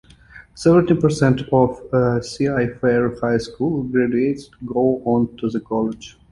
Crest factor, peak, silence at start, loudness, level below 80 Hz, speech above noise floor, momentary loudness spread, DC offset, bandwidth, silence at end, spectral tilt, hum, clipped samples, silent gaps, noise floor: 16 dB; -2 dBFS; 0.35 s; -19 LUFS; -46 dBFS; 26 dB; 7 LU; under 0.1%; 11.5 kHz; 0.2 s; -7.5 dB/octave; none; under 0.1%; none; -45 dBFS